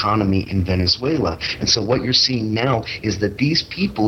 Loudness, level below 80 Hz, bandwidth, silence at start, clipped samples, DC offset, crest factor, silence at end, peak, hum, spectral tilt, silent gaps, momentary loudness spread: -18 LUFS; -40 dBFS; 9.6 kHz; 0 s; under 0.1%; under 0.1%; 16 dB; 0 s; -2 dBFS; none; -4.5 dB/octave; none; 7 LU